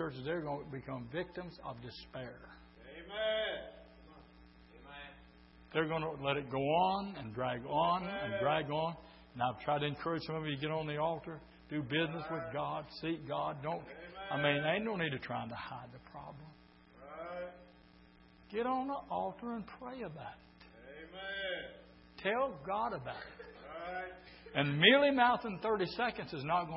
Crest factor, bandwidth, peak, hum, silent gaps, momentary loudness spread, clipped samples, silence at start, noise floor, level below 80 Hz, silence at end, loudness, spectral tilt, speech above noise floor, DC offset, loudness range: 28 dB; 5.6 kHz; -10 dBFS; none; none; 19 LU; under 0.1%; 0 s; -62 dBFS; -64 dBFS; 0 s; -36 LUFS; -3 dB/octave; 25 dB; under 0.1%; 11 LU